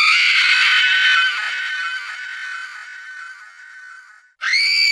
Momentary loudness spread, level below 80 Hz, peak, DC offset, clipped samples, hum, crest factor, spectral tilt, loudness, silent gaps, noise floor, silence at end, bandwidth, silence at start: 21 LU; -84 dBFS; -2 dBFS; under 0.1%; under 0.1%; none; 16 dB; 6 dB/octave; -14 LUFS; none; -44 dBFS; 0 s; 12 kHz; 0 s